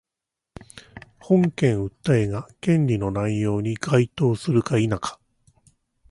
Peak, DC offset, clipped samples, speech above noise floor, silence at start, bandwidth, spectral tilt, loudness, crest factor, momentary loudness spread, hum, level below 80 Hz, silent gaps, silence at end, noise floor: -6 dBFS; under 0.1%; under 0.1%; 65 dB; 0.75 s; 11.5 kHz; -7.5 dB/octave; -22 LUFS; 18 dB; 11 LU; none; -50 dBFS; none; 0.95 s; -86 dBFS